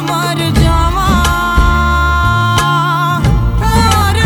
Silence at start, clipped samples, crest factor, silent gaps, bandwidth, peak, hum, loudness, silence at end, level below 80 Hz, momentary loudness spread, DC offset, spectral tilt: 0 s; under 0.1%; 10 dB; none; over 20 kHz; 0 dBFS; none; -11 LUFS; 0 s; -16 dBFS; 2 LU; under 0.1%; -5 dB/octave